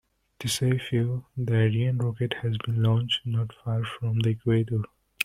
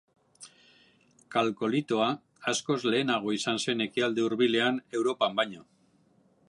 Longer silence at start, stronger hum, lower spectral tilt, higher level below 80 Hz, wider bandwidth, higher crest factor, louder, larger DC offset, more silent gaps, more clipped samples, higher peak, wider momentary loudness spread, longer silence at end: about the same, 0.4 s vs 0.4 s; neither; first, -6 dB/octave vs -4 dB/octave; first, -56 dBFS vs -78 dBFS; first, 13 kHz vs 11.5 kHz; about the same, 22 dB vs 18 dB; about the same, -27 LUFS vs -28 LUFS; neither; neither; neither; first, -4 dBFS vs -12 dBFS; about the same, 6 LU vs 5 LU; second, 0 s vs 0.85 s